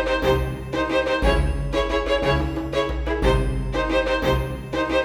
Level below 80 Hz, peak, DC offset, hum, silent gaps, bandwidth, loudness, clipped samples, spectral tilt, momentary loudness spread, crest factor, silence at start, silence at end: -28 dBFS; -6 dBFS; under 0.1%; none; none; 17 kHz; -23 LUFS; under 0.1%; -6 dB/octave; 5 LU; 16 dB; 0 s; 0 s